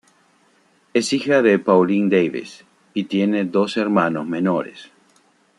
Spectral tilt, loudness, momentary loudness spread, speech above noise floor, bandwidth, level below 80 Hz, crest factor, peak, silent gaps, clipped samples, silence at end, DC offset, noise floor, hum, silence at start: -6 dB/octave; -19 LUFS; 12 LU; 40 dB; 11 kHz; -68 dBFS; 18 dB; -2 dBFS; none; under 0.1%; 0.75 s; under 0.1%; -59 dBFS; none; 0.95 s